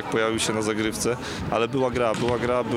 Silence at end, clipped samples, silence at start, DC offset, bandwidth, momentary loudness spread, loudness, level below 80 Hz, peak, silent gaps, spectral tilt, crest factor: 0 s; under 0.1%; 0 s; under 0.1%; 16 kHz; 3 LU; -24 LUFS; -48 dBFS; -8 dBFS; none; -4.5 dB/octave; 16 dB